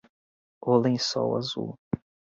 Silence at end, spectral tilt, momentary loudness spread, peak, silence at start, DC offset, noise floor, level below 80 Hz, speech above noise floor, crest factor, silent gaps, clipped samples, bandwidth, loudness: 0.4 s; -5.5 dB/octave; 12 LU; -10 dBFS; 0.65 s; under 0.1%; under -90 dBFS; -62 dBFS; over 65 dB; 18 dB; 1.78-1.91 s; under 0.1%; 7.8 kHz; -27 LUFS